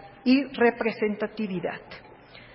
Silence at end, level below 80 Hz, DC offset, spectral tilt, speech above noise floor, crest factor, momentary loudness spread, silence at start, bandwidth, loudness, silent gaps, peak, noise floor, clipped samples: 0.1 s; -62 dBFS; under 0.1%; -10 dB/octave; 23 dB; 18 dB; 17 LU; 0 s; 5.8 kHz; -26 LUFS; none; -10 dBFS; -49 dBFS; under 0.1%